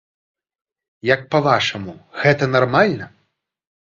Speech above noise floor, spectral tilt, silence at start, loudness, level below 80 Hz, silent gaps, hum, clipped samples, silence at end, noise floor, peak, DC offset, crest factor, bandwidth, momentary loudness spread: 51 dB; -6 dB/octave; 1.05 s; -17 LUFS; -56 dBFS; none; none; under 0.1%; 0.9 s; -69 dBFS; 0 dBFS; under 0.1%; 20 dB; 7.6 kHz; 15 LU